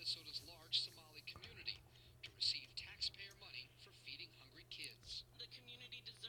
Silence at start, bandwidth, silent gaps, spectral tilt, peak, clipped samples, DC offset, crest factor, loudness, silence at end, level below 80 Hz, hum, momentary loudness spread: 0 s; 19 kHz; none; -1 dB/octave; -26 dBFS; under 0.1%; under 0.1%; 24 dB; -47 LUFS; 0 s; -74 dBFS; none; 16 LU